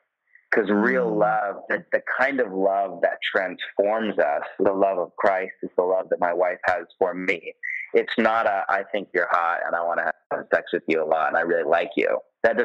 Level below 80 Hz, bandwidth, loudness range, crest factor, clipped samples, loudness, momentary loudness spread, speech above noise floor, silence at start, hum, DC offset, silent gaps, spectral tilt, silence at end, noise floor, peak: -66 dBFS; 8 kHz; 1 LU; 18 dB; under 0.1%; -23 LUFS; 5 LU; 37 dB; 0.5 s; none; under 0.1%; 10.26-10.30 s; -6.5 dB/octave; 0 s; -60 dBFS; -6 dBFS